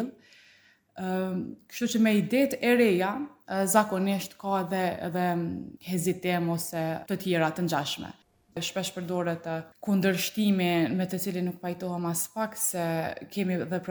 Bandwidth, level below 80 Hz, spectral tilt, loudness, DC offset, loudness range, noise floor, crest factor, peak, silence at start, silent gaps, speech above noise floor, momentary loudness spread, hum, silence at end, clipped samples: over 20 kHz; -68 dBFS; -5 dB/octave; -28 LUFS; under 0.1%; 4 LU; -61 dBFS; 22 dB; -6 dBFS; 0 s; none; 33 dB; 11 LU; none; 0 s; under 0.1%